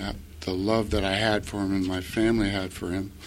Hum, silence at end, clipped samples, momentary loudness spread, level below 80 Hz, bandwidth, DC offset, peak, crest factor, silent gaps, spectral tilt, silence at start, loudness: none; 0 s; under 0.1%; 8 LU; -40 dBFS; 16 kHz; under 0.1%; -8 dBFS; 18 dB; none; -5.5 dB/octave; 0 s; -27 LUFS